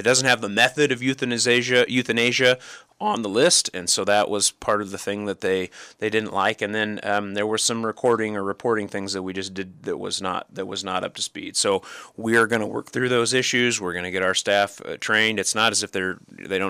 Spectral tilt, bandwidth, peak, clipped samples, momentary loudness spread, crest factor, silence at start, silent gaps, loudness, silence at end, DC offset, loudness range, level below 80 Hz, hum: -2.5 dB/octave; 15.5 kHz; -6 dBFS; under 0.1%; 11 LU; 18 dB; 0 s; none; -22 LUFS; 0 s; under 0.1%; 6 LU; -64 dBFS; none